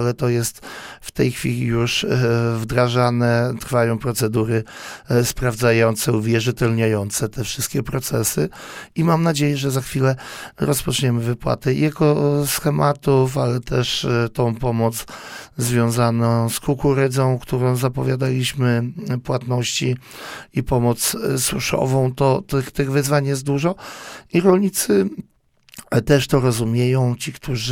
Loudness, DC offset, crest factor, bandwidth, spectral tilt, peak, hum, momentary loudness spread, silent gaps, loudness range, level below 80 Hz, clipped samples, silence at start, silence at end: -19 LUFS; under 0.1%; 18 dB; 17 kHz; -5.5 dB/octave; 0 dBFS; none; 8 LU; none; 2 LU; -42 dBFS; under 0.1%; 0 s; 0 s